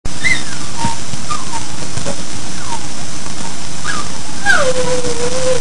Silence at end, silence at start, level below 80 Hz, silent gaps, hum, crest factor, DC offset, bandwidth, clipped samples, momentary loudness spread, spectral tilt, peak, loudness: 0 s; 0.05 s; -34 dBFS; none; none; 18 dB; 40%; 12 kHz; under 0.1%; 11 LU; -3 dB/octave; 0 dBFS; -19 LUFS